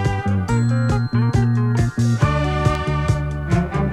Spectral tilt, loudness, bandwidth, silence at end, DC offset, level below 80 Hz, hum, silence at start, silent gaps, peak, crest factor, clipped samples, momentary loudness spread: -7.5 dB/octave; -19 LUFS; 10.5 kHz; 0 s; under 0.1%; -30 dBFS; none; 0 s; none; -4 dBFS; 14 dB; under 0.1%; 3 LU